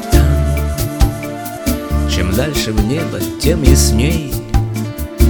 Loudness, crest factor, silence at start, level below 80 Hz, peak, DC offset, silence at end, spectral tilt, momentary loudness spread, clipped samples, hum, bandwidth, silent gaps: -16 LUFS; 14 dB; 0 s; -18 dBFS; 0 dBFS; under 0.1%; 0 s; -5.5 dB/octave; 10 LU; under 0.1%; none; over 20 kHz; none